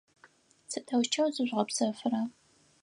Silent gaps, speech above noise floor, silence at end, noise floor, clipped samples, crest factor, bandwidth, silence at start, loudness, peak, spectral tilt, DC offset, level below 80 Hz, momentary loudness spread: none; 32 dB; 0.5 s; -63 dBFS; under 0.1%; 20 dB; 11.5 kHz; 0.7 s; -31 LUFS; -12 dBFS; -3.5 dB/octave; under 0.1%; -84 dBFS; 10 LU